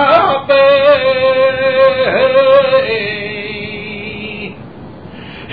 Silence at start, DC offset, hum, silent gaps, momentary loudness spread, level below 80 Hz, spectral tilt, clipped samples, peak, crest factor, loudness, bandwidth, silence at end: 0 s; 0.6%; none; none; 22 LU; -46 dBFS; -7 dB/octave; under 0.1%; 0 dBFS; 12 dB; -11 LUFS; 5 kHz; 0 s